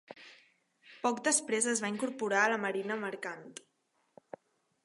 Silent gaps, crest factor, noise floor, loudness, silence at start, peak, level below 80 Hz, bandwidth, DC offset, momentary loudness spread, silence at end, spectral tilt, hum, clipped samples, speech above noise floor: none; 22 dB; -67 dBFS; -32 LUFS; 0.1 s; -14 dBFS; -86 dBFS; 11.5 kHz; under 0.1%; 23 LU; 1.3 s; -2.5 dB/octave; none; under 0.1%; 34 dB